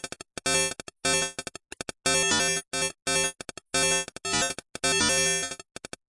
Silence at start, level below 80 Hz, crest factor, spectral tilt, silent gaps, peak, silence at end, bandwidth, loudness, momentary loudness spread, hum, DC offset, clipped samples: 0.05 s; -56 dBFS; 18 dB; -1 dB/octave; none; -10 dBFS; 0.55 s; 11.5 kHz; -25 LUFS; 16 LU; none; under 0.1%; under 0.1%